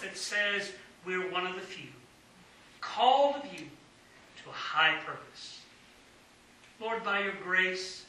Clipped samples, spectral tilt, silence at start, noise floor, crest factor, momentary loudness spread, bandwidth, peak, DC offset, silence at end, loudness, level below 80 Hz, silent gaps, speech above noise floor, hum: under 0.1%; -2.5 dB/octave; 0 s; -59 dBFS; 22 dB; 19 LU; 13 kHz; -12 dBFS; under 0.1%; 0 s; -30 LUFS; -74 dBFS; none; 27 dB; none